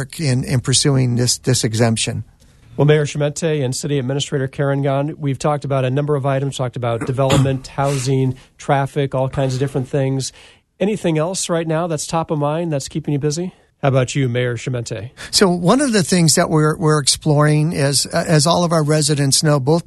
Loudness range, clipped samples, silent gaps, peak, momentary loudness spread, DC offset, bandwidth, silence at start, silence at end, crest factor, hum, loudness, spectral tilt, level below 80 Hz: 5 LU; under 0.1%; none; 0 dBFS; 8 LU; under 0.1%; 12.5 kHz; 0 s; 0.05 s; 18 dB; none; -17 LUFS; -5 dB/octave; -46 dBFS